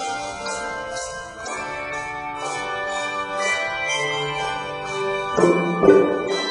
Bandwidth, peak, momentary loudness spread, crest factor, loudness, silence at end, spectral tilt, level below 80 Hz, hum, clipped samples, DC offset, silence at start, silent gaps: 10.5 kHz; -2 dBFS; 12 LU; 20 dB; -22 LUFS; 0 s; -4 dB/octave; -52 dBFS; none; under 0.1%; under 0.1%; 0 s; none